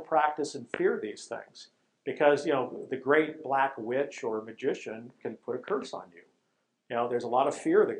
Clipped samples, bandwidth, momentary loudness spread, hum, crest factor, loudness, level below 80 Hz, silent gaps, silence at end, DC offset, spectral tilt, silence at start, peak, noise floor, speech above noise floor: under 0.1%; 10.5 kHz; 16 LU; none; 22 dB; -30 LUFS; -84 dBFS; none; 0 s; under 0.1%; -5 dB/octave; 0 s; -8 dBFS; -77 dBFS; 48 dB